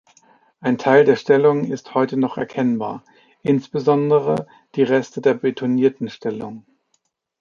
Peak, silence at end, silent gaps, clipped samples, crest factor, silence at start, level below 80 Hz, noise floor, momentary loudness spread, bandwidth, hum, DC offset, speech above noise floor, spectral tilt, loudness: -2 dBFS; 0.8 s; none; under 0.1%; 18 dB; 0.6 s; -64 dBFS; -69 dBFS; 12 LU; 7.2 kHz; none; under 0.1%; 51 dB; -7.5 dB/octave; -19 LUFS